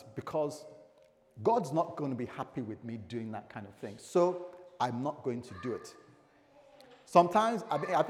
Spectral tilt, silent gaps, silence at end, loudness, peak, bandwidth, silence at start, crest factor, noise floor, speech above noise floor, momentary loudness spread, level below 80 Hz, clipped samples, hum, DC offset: -6.5 dB/octave; none; 0 s; -33 LUFS; -8 dBFS; 14.5 kHz; 0 s; 26 dB; -64 dBFS; 31 dB; 18 LU; -76 dBFS; under 0.1%; none; under 0.1%